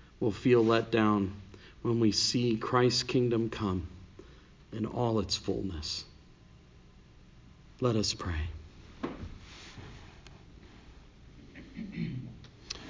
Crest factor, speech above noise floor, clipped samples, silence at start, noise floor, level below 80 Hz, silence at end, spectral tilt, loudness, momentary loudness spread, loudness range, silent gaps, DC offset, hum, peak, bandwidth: 20 dB; 27 dB; under 0.1%; 0.2 s; -56 dBFS; -50 dBFS; 0 s; -5 dB/octave; -30 LUFS; 23 LU; 17 LU; none; under 0.1%; none; -14 dBFS; 7.6 kHz